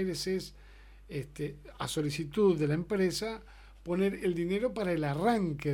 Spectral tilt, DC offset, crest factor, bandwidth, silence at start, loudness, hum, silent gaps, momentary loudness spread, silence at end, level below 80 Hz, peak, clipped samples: -6 dB/octave; under 0.1%; 18 dB; 17.5 kHz; 0 s; -32 LUFS; none; none; 13 LU; 0 s; -54 dBFS; -14 dBFS; under 0.1%